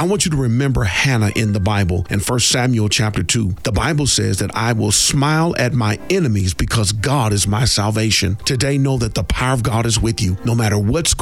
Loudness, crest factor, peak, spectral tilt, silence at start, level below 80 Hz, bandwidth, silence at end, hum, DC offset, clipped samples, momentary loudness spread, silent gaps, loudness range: -16 LUFS; 14 dB; -2 dBFS; -4 dB/octave; 0 s; -32 dBFS; 16 kHz; 0 s; none; 0.5%; under 0.1%; 4 LU; none; 1 LU